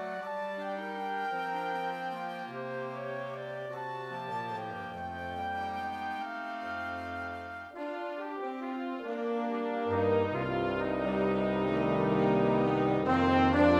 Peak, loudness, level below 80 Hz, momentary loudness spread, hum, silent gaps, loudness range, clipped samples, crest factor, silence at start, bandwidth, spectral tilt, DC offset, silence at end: -12 dBFS; -32 LUFS; -58 dBFS; 11 LU; none; none; 9 LU; under 0.1%; 20 dB; 0 s; 12.5 kHz; -7.5 dB/octave; under 0.1%; 0 s